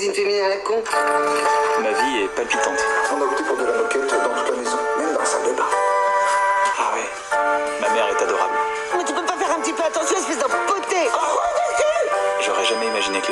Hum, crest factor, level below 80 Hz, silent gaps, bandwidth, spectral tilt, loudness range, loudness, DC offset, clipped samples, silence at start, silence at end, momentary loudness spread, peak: none; 14 dB; -58 dBFS; none; 12.5 kHz; -1 dB/octave; 1 LU; -20 LUFS; under 0.1%; under 0.1%; 0 s; 0 s; 3 LU; -6 dBFS